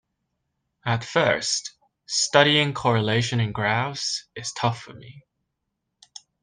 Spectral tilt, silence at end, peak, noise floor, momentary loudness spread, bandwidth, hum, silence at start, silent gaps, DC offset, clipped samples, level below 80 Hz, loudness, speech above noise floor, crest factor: -3.5 dB/octave; 1.25 s; 0 dBFS; -79 dBFS; 14 LU; 10 kHz; none; 0.85 s; none; under 0.1%; under 0.1%; -60 dBFS; -23 LUFS; 56 dB; 24 dB